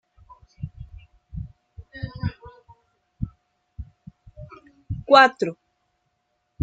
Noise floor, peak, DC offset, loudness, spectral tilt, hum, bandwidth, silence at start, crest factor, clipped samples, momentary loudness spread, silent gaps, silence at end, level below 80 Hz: -74 dBFS; -2 dBFS; under 0.1%; -20 LUFS; -5.5 dB/octave; none; 9 kHz; 0.6 s; 24 dB; under 0.1%; 30 LU; none; 1.1 s; -46 dBFS